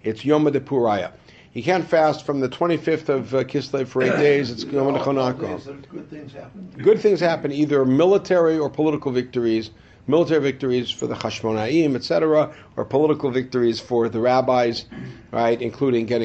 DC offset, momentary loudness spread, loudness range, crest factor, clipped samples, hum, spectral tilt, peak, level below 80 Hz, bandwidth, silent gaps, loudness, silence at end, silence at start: under 0.1%; 14 LU; 3 LU; 16 dB; under 0.1%; none; -6.5 dB/octave; -4 dBFS; -56 dBFS; 8.2 kHz; none; -21 LUFS; 0 s; 0.05 s